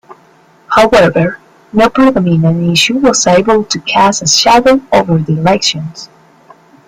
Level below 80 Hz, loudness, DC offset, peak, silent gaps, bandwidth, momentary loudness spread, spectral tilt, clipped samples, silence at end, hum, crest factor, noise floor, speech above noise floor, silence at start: -40 dBFS; -9 LUFS; under 0.1%; 0 dBFS; none; 16 kHz; 9 LU; -4 dB/octave; under 0.1%; 0.85 s; none; 10 dB; -45 dBFS; 36 dB; 0.1 s